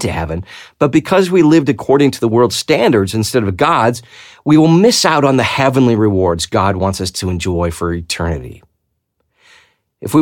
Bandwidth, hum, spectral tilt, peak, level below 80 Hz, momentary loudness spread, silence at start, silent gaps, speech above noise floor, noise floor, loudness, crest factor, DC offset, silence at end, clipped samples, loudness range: 17.5 kHz; none; -5.5 dB/octave; 0 dBFS; -38 dBFS; 11 LU; 0 s; none; 55 dB; -68 dBFS; -13 LUFS; 12 dB; under 0.1%; 0 s; under 0.1%; 7 LU